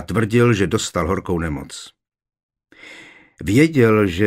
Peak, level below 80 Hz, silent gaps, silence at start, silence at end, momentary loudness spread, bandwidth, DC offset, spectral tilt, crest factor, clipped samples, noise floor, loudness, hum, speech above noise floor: -2 dBFS; -42 dBFS; 2.43-2.49 s; 0 s; 0 s; 20 LU; 16 kHz; under 0.1%; -6 dB/octave; 18 dB; under 0.1%; -43 dBFS; -17 LUFS; none; 26 dB